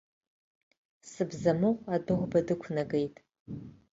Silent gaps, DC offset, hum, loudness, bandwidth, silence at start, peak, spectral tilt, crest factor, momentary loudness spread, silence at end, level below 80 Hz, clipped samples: 3.40-3.46 s; under 0.1%; none; -31 LUFS; 8 kHz; 1.05 s; -14 dBFS; -7.5 dB/octave; 20 dB; 17 LU; 0.25 s; -62 dBFS; under 0.1%